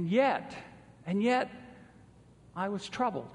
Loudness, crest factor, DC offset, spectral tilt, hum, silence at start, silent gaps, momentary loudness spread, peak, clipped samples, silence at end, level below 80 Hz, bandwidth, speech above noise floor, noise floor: -31 LUFS; 18 dB; under 0.1%; -6 dB/octave; none; 0 s; none; 21 LU; -14 dBFS; under 0.1%; 0 s; -68 dBFS; 10.5 kHz; 27 dB; -57 dBFS